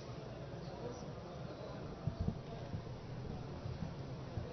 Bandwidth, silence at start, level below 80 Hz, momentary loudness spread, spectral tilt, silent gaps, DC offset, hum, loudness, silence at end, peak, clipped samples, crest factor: 6.2 kHz; 0 s; -56 dBFS; 6 LU; -7 dB/octave; none; under 0.1%; none; -46 LUFS; 0 s; -24 dBFS; under 0.1%; 22 dB